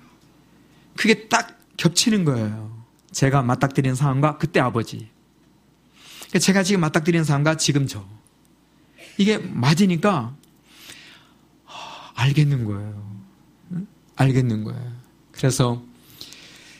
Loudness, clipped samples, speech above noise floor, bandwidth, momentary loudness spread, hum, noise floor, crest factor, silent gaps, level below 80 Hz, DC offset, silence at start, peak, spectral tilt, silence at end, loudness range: -21 LUFS; under 0.1%; 37 dB; 15.5 kHz; 21 LU; none; -57 dBFS; 22 dB; none; -54 dBFS; under 0.1%; 1 s; 0 dBFS; -5 dB/octave; 0.35 s; 4 LU